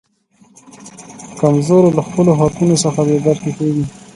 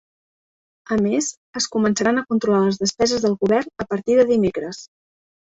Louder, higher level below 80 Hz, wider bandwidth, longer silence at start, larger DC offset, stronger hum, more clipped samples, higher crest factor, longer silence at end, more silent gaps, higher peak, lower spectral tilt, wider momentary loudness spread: first, -14 LUFS vs -20 LUFS; first, -48 dBFS vs -54 dBFS; first, 11.5 kHz vs 8.2 kHz; about the same, 0.8 s vs 0.9 s; neither; neither; neither; about the same, 14 dB vs 16 dB; second, 0.25 s vs 0.55 s; second, none vs 1.37-1.53 s; first, 0 dBFS vs -4 dBFS; first, -6.5 dB/octave vs -4.5 dB/octave; first, 21 LU vs 9 LU